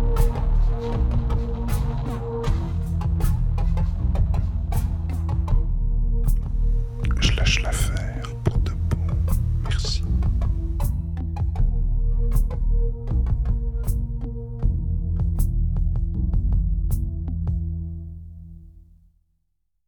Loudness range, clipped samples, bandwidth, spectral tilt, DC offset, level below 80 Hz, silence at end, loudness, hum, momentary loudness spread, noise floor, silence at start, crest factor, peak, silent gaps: 2 LU; under 0.1%; 18 kHz; -6 dB/octave; under 0.1%; -22 dBFS; 1.05 s; -25 LUFS; none; 5 LU; -74 dBFS; 0 s; 16 dB; -6 dBFS; none